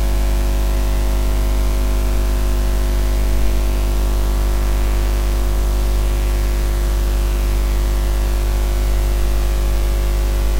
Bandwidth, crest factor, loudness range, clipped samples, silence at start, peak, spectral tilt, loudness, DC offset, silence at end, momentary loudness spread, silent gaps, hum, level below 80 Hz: 16 kHz; 12 dB; 0 LU; under 0.1%; 0 s; -4 dBFS; -5.5 dB/octave; -20 LUFS; under 0.1%; 0 s; 0 LU; none; 50 Hz at -15 dBFS; -16 dBFS